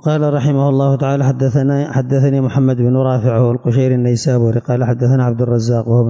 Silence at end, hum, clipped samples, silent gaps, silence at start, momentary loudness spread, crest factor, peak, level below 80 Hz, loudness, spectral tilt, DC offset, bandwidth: 0 s; none; under 0.1%; none; 0.05 s; 2 LU; 10 dB; -4 dBFS; -48 dBFS; -14 LUFS; -8.5 dB/octave; under 0.1%; 7.8 kHz